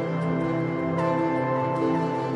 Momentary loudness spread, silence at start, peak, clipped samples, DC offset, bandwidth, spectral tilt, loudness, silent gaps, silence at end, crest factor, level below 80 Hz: 2 LU; 0 s; -12 dBFS; under 0.1%; under 0.1%; 9.8 kHz; -8.5 dB/octave; -25 LUFS; none; 0 s; 12 dB; -58 dBFS